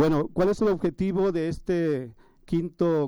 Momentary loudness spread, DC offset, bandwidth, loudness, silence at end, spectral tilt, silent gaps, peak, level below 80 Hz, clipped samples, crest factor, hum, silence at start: 6 LU; under 0.1%; over 20 kHz; -26 LUFS; 0 s; -8 dB/octave; none; -12 dBFS; -46 dBFS; under 0.1%; 12 dB; none; 0 s